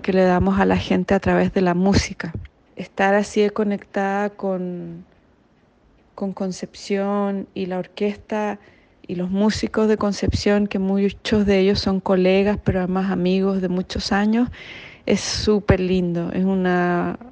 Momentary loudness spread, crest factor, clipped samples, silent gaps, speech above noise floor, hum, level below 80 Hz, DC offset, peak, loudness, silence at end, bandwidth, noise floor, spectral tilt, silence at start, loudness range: 12 LU; 18 dB; under 0.1%; none; 37 dB; none; -40 dBFS; under 0.1%; -2 dBFS; -20 LUFS; 0 s; 9.2 kHz; -57 dBFS; -6 dB/octave; 0 s; 7 LU